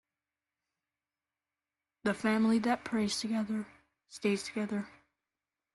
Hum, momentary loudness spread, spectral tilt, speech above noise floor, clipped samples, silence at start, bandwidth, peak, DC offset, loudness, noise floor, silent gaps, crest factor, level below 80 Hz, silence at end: none; 11 LU; -5 dB/octave; over 58 dB; under 0.1%; 2.05 s; 12 kHz; -16 dBFS; under 0.1%; -33 LUFS; under -90 dBFS; none; 20 dB; -72 dBFS; 0.85 s